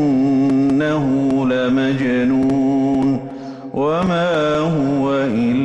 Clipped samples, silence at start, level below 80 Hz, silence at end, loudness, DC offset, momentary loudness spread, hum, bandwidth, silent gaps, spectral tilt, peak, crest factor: under 0.1%; 0 s; -48 dBFS; 0 s; -17 LUFS; under 0.1%; 4 LU; none; 8.2 kHz; none; -7.5 dB/octave; -10 dBFS; 8 dB